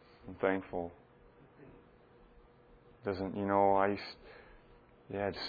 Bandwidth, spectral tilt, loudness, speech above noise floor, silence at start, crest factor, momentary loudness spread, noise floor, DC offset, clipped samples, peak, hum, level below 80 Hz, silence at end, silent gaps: 4.9 kHz; -7.5 dB/octave; -34 LUFS; 28 dB; 0.25 s; 24 dB; 24 LU; -61 dBFS; under 0.1%; under 0.1%; -14 dBFS; none; -64 dBFS; 0 s; none